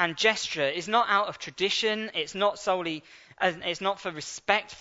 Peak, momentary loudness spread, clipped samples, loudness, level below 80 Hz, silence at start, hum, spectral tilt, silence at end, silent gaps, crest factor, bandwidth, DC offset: -6 dBFS; 10 LU; under 0.1%; -27 LUFS; -68 dBFS; 0 s; none; -2.5 dB/octave; 0 s; none; 24 dB; 8 kHz; under 0.1%